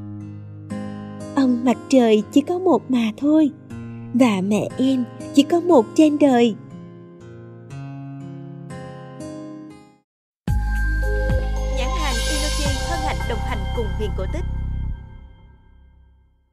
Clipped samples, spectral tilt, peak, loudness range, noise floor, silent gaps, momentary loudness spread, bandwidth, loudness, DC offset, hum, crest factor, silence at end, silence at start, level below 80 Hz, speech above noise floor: under 0.1%; -6 dB/octave; -2 dBFS; 13 LU; -55 dBFS; 10.04-10.45 s; 20 LU; 15 kHz; -20 LUFS; under 0.1%; none; 20 dB; 1.05 s; 0 s; -30 dBFS; 38 dB